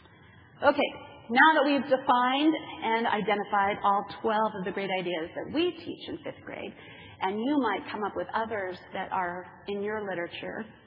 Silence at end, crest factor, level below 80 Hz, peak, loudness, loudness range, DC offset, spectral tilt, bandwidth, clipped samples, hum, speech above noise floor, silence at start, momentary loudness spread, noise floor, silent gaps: 0.15 s; 22 dB; -70 dBFS; -6 dBFS; -28 LUFS; 8 LU; under 0.1%; -8 dB/octave; 5.6 kHz; under 0.1%; none; 26 dB; 0.6 s; 15 LU; -54 dBFS; none